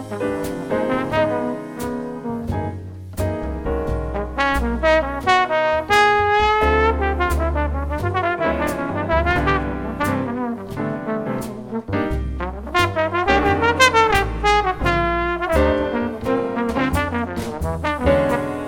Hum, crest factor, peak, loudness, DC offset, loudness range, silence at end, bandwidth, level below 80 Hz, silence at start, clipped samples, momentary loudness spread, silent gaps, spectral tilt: none; 16 dB; -2 dBFS; -20 LUFS; under 0.1%; 7 LU; 0 s; 17.5 kHz; -30 dBFS; 0 s; under 0.1%; 10 LU; none; -5.5 dB/octave